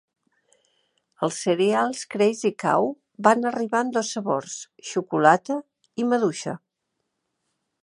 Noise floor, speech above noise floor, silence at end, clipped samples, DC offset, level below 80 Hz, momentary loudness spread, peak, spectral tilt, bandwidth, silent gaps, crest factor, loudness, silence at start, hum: -79 dBFS; 56 dB; 1.25 s; under 0.1%; under 0.1%; -76 dBFS; 12 LU; -2 dBFS; -4.5 dB/octave; 11.5 kHz; none; 22 dB; -23 LUFS; 1.2 s; none